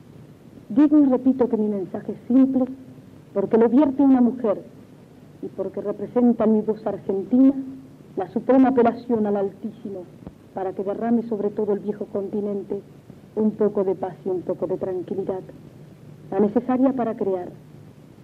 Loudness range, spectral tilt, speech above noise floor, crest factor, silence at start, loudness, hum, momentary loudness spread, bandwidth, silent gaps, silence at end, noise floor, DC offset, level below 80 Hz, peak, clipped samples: 6 LU; -10 dB/octave; 25 dB; 14 dB; 0.2 s; -22 LUFS; none; 16 LU; 4.4 kHz; none; 0.35 s; -46 dBFS; under 0.1%; -62 dBFS; -8 dBFS; under 0.1%